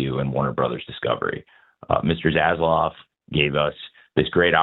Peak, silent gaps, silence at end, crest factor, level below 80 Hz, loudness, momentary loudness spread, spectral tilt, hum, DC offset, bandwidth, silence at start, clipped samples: -2 dBFS; none; 0 s; 20 dB; -46 dBFS; -22 LUFS; 8 LU; -9 dB/octave; none; under 0.1%; 4.2 kHz; 0 s; under 0.1%